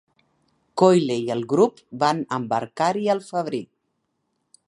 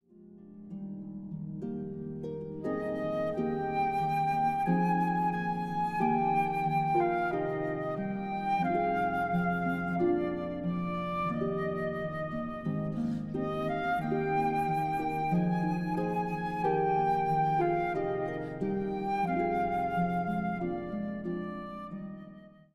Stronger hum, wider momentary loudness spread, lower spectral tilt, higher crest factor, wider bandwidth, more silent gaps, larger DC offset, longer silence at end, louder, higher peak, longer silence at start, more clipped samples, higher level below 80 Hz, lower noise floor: neither; about the same, 10 LU vs 11 LU; second, -6 dB/octave vs -8.5 dB/octave; first, 22 dB vs 14 dB; about the same, 11.5 kHz vs 12.5 kHz; neither; neither; first, 1.05 s vs 0.25 s; first, -22 LUFS vs -31 LUFS; first, -2 dBFS vs -16 dBFS; first, 0.75 s vs 0.2 s; neither; second, -72 dBFS vs -58 dBFS; first, -74 dBFS vs -53 dBFS